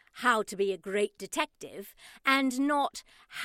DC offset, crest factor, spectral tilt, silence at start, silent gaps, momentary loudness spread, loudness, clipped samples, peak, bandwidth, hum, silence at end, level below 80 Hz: under 0.1%; 20 dB; -3 dB/octave; 0.15 s; none; 18 LU; -29 LUFS; under 0.1%; -10 dBFS; 16.5 kHz; none; 0 s; -70 dBFS